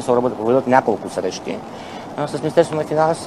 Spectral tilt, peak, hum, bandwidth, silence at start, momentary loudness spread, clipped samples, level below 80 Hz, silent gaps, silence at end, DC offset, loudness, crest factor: -6 dB/octave; 0 dBFS; none; 13 kHz; 0 s; 14 LU; under 0.1%; -56 dBFS; none; 0 s; 0.1%; -19 LUFS; 18 dB